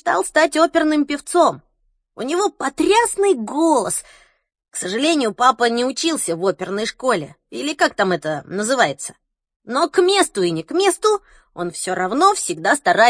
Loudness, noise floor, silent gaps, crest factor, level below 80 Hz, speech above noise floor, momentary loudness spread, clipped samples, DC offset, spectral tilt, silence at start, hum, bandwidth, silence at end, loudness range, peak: -18 LUFS; -66 dBFS; 9.56-9.60 s; 18 dB; -58 dBFS; 48 dB; 9 LU; under 0.1%; under 0.1%; -3 dB/octave; 0.05 s; none; 10.5 kHz; 0 s; 3 LU; 0 dBFS